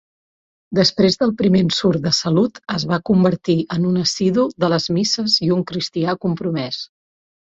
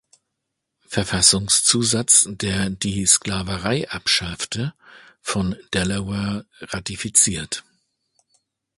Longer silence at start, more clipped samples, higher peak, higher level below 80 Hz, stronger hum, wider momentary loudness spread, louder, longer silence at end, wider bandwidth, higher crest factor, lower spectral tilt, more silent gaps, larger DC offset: second, 0.7 s vs 0.9 s; neither; about the same, -2 dBFS vs 0 dBFS; second, -54 dBFS vs -44 dBFS; neither; second, 7 LU vs 15 LU; about the same, -18 LUFS vs -19 LUFS; second, 0.55 s vs 1.15 s; second, 7.8 kHz vs 12 kHz; second, 16 dB vs 22 dB; first, -5.5 dB/octave vs -2.5 dB/octave; neither; neither